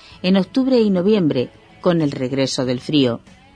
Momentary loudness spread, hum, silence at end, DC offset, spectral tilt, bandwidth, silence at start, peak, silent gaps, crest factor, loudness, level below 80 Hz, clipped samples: 7 LU; none; 0.35 s; under 0.1%; -6.5 dB/octave; 10 kHz; 0.1 s; -4 dBFS; none; 14 dB; -18 LUFS; -54 dBFS; under 0.1%